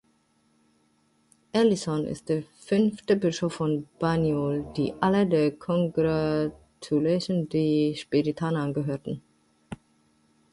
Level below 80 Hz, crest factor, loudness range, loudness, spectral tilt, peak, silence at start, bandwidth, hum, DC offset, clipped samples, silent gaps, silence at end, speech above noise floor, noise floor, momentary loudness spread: -58 dBFS; 18 dB; 2 LU; -26 LUFS; -7 dB/octave; -8 dBFS; 1.55 s; 11.5 kHz; none; under 0.1%; under 0.1%; none; 0.8 s; 42 dB; -67 dBFS; 9 LU